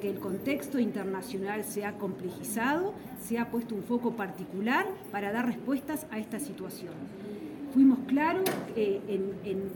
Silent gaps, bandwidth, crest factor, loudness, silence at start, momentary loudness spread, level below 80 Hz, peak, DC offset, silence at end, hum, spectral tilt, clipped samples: none; 17 kHz; 18 dB; -31 LUFS; 0 s; 13 LU; -66 dBFS; -14 dBFS; under 0.1%; 0 s; none; -5.5 dB/octave; under 0.1%